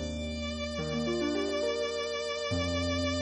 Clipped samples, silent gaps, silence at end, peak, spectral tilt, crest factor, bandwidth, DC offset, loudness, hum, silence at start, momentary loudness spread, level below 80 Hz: under 0.1%; none; 0 s; -20 dBFS; -4.5 dB/octave; 12 dB; 10 kHz; under 0.1%; -32 LUFS; none; 0 s; 5 LU; -46 dBFS